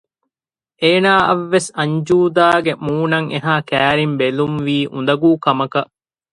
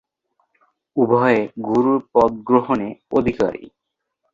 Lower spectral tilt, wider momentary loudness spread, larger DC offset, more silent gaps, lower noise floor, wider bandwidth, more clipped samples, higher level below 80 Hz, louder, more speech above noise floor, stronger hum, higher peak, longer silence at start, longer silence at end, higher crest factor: second, -5.5 dB/octave vs -8 dB/octave; about the same, 7 LU vs 7 LU; neither; neither; first, under -90 dBFS vs -78 dBFS; first, 11.5 kHz vs 7.4 kHz; neither; about the same, -54 dBFS vs -52 dBFS; first, -16 LUFS vs -19 LUFS; first, over 75 dB vs 60 dB; neither; about the same, 0 dBFS vs -2 dBFS; second, 0.8 s vs 0.95 s; second, 0.5 s vs 0.65 s; about the same, 16 dB vs 18 dB